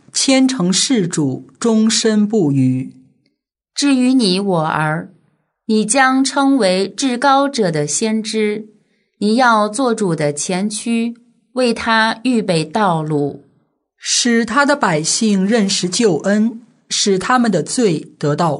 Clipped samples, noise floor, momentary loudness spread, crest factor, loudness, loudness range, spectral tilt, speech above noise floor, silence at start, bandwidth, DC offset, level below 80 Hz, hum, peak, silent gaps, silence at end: under 0.1%; -68 dBFS; 7 LU; 16 dB; -15 LUFS; 2 LU; -4 dB/octave; 53 dB; 0.15 s; 11 kHz; under 0.1%; -60 dBFS; none; 0 dBFS; none; 0 s